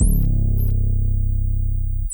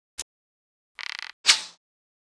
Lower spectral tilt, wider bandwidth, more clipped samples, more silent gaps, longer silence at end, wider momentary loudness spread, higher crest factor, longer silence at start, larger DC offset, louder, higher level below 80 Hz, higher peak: first, -8.5 dB/octave vs 4 dB/octave; first, over 20 kHz vs 11 kHz; neither; second, none vs 0.22-0.95 s, 1.33-1.44 s; second, 0 s vs 0.55 s; second, 4 LU vs 21 LU; second, 12 dB vs 28 dB; second, 0 s vs 0.2 s; neither; about the same, -22 LUFS vs -23 LUFS; first, -18 dBFS vs -70 dBFS; about the same, -4 dBFS vs -2 dBFS